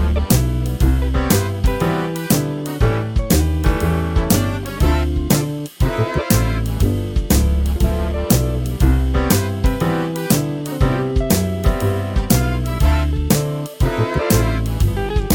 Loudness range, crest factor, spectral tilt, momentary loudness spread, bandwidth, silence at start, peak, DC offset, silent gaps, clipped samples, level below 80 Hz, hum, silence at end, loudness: 1 LU; 16 dB; -5.5 dB/octave; 4 LU; 19.5 kHz; 0 s; 0 dBFS; under 0.1%; none; under 0.1%; -20 dBFS; none; 0 s; -18 LUFS